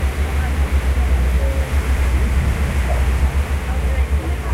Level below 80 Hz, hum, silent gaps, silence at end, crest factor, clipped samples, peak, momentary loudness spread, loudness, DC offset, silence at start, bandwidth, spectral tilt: -18 dBFS; none; none; 0 s; 10 dB; under 0.1%; -6 dBFS; 3 LU; -19 LUFS; under 0.1%; 0 s; 14 kHz; -6 dB/octave